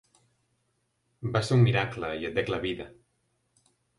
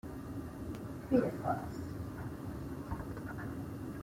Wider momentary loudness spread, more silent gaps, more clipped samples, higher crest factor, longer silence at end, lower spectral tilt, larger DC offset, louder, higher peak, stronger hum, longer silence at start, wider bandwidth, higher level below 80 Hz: first, 16 LU vs 11 LU; neither; neither; about the same, 20 dB vs 22 dB; first, 1.05 s vs 0 s; second, -6.5 dB/octave vs -8 dB/octave; neither; first, -28 LUFS vs -40 LUFS; first, -10 dBFS vs -16 dBFS; neither; first, 1.2 s vs 0.05 s; second, 11.5 kHz vs 16.5 kHz; about the same, -56 dBFS vs -54 dBFS